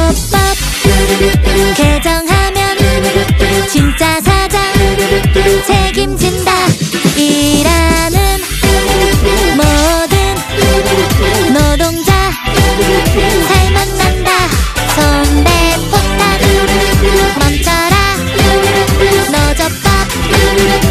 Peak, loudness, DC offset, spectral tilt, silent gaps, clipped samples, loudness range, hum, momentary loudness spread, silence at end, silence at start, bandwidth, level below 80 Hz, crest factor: 0 dBFS; -10 LUFS; under 0.1%; -4.5 dB/octave; none; under 0.1%; 1 LU; none; 3 LU; 0 s; 0 s; 15.5 kHz; -16 dBFS; 10 dB